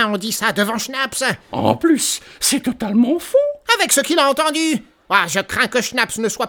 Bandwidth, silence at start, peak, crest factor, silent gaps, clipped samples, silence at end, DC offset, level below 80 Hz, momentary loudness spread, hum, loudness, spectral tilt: over 20 kHz; 0 s; 0 dBFS; 18 dB; none; under 0.1%; 0 s; under 0.1%; -54 dBFS; 6 LU; none; -17 LUFS; -2.5 dB/octave